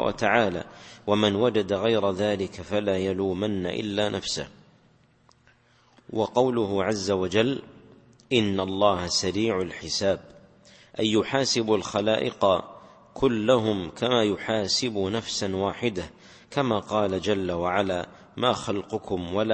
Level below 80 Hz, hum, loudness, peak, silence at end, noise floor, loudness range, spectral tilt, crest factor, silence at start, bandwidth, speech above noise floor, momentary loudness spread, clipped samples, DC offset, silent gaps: -56 dBFS; none; -25 LUFS; -4 dBFS; 0 s; -60 dBFS; 4 LU; -4.5 dB/octave; 22 dB; 0 s; 8.8 kHz; 35 dB; 8 LU; under 0.1%; under 0.1%; none